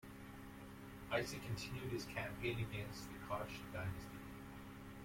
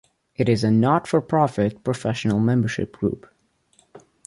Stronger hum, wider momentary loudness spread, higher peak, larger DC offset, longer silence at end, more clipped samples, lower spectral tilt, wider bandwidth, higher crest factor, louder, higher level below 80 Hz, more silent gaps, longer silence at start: neither; first, 12 LU vs 8 LU; second, -26 dBFS vs -4 dBFS; neither; second, 0 s vs 0.3 s; neither; second, -5 dB/octave vs -7 dB/octave; first, 16.5 kHz vs 11.5 kHz; about the same, 20 dB vs 18 dB; second, -47 LUFS vs -22 LUFS; second, -62 dBFS vs -52 dBFS; neither; second, 0 s vs 0.4 s